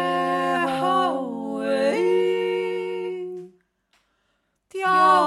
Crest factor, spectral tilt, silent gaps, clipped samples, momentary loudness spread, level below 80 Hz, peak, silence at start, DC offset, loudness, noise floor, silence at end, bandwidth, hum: 18 dB; -5 dB/octave; none; under 0.1%; 11 LU; -74 dBFS; -6 dBFS; 0 s; under 0.1%; -23 LUFS; -71 dBFS; 0 s; 12.5 kHz; none